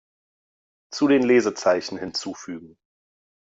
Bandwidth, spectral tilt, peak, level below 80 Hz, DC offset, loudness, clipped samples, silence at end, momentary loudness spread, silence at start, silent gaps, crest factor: 7.8 kHz; -4.5 dB/octave; -8 dBFS; -66 dBFS; under 0.1%; -21 LUFS; under 0.1%; 0.85 s; 19 LU; 0.9 s; none; 18 dB